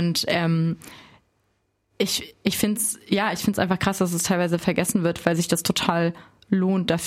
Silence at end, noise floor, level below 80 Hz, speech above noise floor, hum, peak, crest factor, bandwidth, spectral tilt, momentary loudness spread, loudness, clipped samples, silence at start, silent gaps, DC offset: 0 s; -70 dBFS; -54 dBFS; 47 dB; none; -4 dBFS; 20 dB; 16.5 kHz; -4.5 dB/octave; 5 LU; -23 LUFS; under 0.1%; 0 s; none; under 0.1%